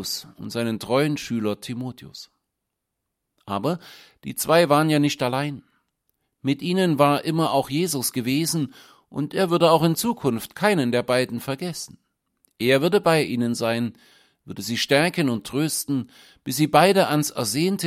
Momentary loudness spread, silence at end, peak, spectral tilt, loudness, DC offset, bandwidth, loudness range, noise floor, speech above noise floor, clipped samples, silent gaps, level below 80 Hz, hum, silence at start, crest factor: 15 LU; 0 s; -2 dBFS; -5 dB/octave; -22 LUFS; under 0.1%; 16.5 kHz; 6 LU; -81 dBFS; 59 dB; under 0.1%; none; -62 dBFS; none; 0 s; 22 dB